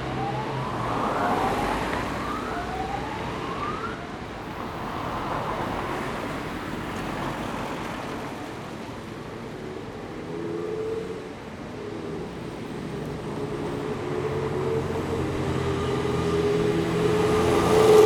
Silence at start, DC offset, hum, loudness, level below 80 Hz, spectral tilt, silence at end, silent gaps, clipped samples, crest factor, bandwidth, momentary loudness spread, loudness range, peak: 0 s; under 0.1%; none; -28 LUFS; -46 dBFS; -6 dB/octave; 0 s; none; under 0.1%; 22 dB; 18 kHz; 12 LU; 8 LU; -6 dBFS